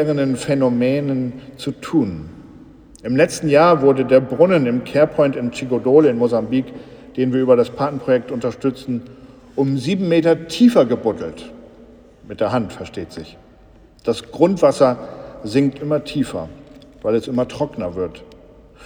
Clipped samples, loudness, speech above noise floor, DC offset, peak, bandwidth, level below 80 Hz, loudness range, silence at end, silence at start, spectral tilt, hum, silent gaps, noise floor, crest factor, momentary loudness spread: under 0.1%; -18 LUFS; 30 dB; under 0.1%; 0 dBFS; 15 kHz; -50 dBFS; 7 LU; 0 s; 0 s; -6.5 dB/octave; none; none; -47 dBFS; 18 dB; 17 LU